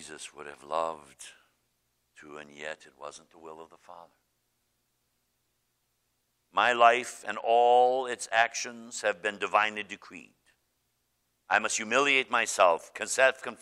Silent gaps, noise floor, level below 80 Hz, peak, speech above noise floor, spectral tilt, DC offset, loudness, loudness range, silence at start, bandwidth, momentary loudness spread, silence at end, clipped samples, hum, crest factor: none; -77 dBFS; -78 dBFS; -6 dBFS; 48 dB; -1 dB/octave; under 0.1%; -26 LUFS; 21 LU; 0 s; 14 kHz; 24 LU; 0.05 s; under 0.1%; 60 Hz at -75 dBFS; 24 dB